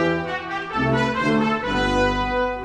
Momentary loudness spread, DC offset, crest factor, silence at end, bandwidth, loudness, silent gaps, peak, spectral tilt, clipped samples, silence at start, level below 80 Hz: 6 LU; under 0.1%; 14 dB; 0 s; 10.5 kHz; -21 LUFS; none; -8 dBFS; -6 dB/octave; under 0.1%; 0 s; -36 dBFS